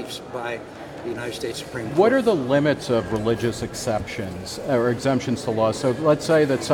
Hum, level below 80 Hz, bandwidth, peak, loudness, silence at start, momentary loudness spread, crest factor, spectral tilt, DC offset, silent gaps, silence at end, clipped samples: none; -50 dBFS; 18 kHz; -6 dBFS; -23 LUFS; 0 s; 12 LU; 16 dB; -5.5 dB/octave; under 0.1%; none; 0 s; under 0.1%